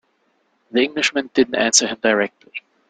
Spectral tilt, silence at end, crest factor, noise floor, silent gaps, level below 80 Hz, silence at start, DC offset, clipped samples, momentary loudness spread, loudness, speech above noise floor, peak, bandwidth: -1.5 dB/octave; 0.3 s; 20 dB; -65 dBFS; none; -60 dBFS; 0.75 s; under 0.1%; under 0.1%; 11 LU; -18 LUFS; 46 dB; 0 dBFS; 10.5 kHz